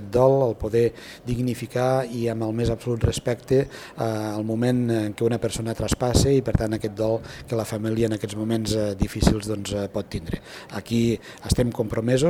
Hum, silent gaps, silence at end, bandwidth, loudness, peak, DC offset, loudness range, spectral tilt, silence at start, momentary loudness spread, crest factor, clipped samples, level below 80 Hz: none; none; 0 s; 16.5 kHz; -24 LUFS; -2 dBFS; under 0.1%; 2 LU; -6 dB/octave; 0 s; 9 LU; 22 dB; under 0.1%; -38 dBFS